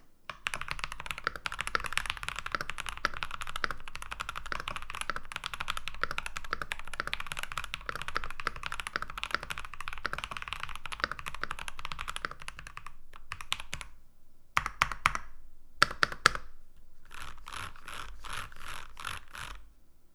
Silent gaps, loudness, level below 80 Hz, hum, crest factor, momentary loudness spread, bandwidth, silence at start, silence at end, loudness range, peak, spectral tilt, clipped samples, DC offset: none; -36 LUFS; -46 dBFS; none; 36 dB; 15 LU; 15.5 kHz; 0 s; 0 s; 8 LU; 0 dBFS; -1.5 dB/octave; under 0.1%; under 0.1%